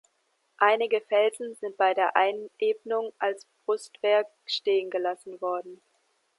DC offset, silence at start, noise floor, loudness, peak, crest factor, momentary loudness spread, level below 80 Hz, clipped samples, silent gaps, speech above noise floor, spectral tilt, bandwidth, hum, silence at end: under 0.1%; 0.6 s; -73 dBFS; -27 LUFS; -6 dBFS; 22 dB; 10 LU; -88 dBFS; under 0.1%; none; 46 dB; -2.5 dB/octave; 11.5 kHz; none; 0.65 s